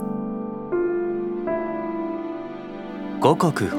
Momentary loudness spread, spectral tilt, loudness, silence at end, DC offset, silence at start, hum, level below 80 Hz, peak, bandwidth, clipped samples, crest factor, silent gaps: 13 LU; -7 dB/octave; -25 LUFS; 0 s; under 0.1%; 0 s; 50 Hz at -65 dBFS; -56 dBFS; -2 dBFS; 15 kHz; under 0.1%; 22 dB; none